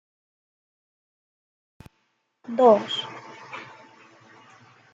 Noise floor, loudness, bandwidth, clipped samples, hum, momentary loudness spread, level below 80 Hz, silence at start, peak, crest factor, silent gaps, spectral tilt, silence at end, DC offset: -72 dBFS; -21 LUFS; 7.8 kHz; under 0.1%; none; 23 LU; -72 dBFS; 2.5 s; -4 dBFS; 24 dB; none; -5 dB/octave; 1.3 s; under 0.1%